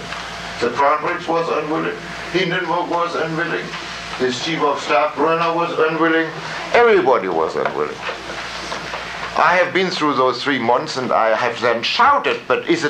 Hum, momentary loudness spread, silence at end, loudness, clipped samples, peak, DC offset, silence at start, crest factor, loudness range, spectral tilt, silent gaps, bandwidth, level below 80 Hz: none; 12 LU; 0 s; -18 LUFS; under 0.1%; -2 dBFS; under 0.1%; 0 s; 16 dB; 4 LU; -4.5 dB/octave; none; 11.5 kHz; -52 dBFS